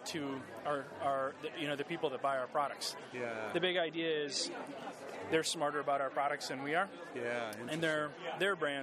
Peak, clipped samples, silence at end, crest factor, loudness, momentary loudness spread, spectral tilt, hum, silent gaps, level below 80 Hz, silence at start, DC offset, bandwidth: -18 dBFS; under 0.1%; 0 s; 20 dB; -37 LUFS; 8 LU; -3.5 dB/octave; none; none; -86 dBFS; 0 s; under 0.1%; 15 kHz